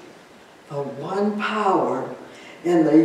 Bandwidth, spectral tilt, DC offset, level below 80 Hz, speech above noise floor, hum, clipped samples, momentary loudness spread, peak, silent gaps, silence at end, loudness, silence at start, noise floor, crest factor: 9.8 kHz; -7 dB/octave; under 0.1%; -74 dBFS; 27 dB; none; under 0.1%; 14 LU; -4 dBFS; none; 0 s; -23 LUFS; 0 s; -47 dBFS; 18 dB